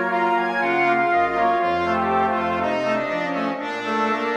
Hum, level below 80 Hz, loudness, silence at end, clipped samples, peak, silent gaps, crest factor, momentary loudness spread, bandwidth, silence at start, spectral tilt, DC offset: none; -56 dBFS; -21 LUFS; 0 s; under 0.1%; -8 dBFS; none; 14 dB; 5 LU; 9.6 kHz; 0 s; -5.5 dB/octave; under 0.1%